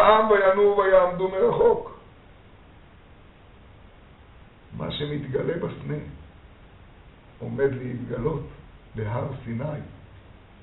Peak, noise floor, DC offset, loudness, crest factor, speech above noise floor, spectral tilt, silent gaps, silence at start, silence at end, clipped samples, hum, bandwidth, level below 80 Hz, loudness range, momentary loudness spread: -2 dBFS; -50 dBFS; under 0.1%; -24 LUFS; 24 dB; 27 dB; -5 dB/octave; none; 0 s; 0.3 s; under 0.1%; none; 4.1 kHz; -50 dBFS; 12 LU; 21 LU